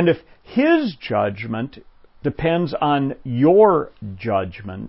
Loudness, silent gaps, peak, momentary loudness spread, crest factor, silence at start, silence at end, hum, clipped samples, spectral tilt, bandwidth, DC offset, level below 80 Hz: -19 LUFS; none; -2 dBFS; 14 LU; 18 dB; 0 s; 0 s; none; under 0.1%; -12 dB/octave; 5.8 kHz; under 0.1%; -48 dBFS